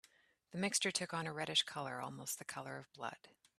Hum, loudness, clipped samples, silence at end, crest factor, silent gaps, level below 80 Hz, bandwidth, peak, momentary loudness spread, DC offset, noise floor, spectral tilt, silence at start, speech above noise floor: none; -40 LUFS; under 0.1%; 0.3 s; 24 dB; none; -82 dBFS; 15 kHz; -20 dBFS; 13 LU; under 0.1%; -71 dBFS; -2 dB/octave; 0.5 s; 29 dB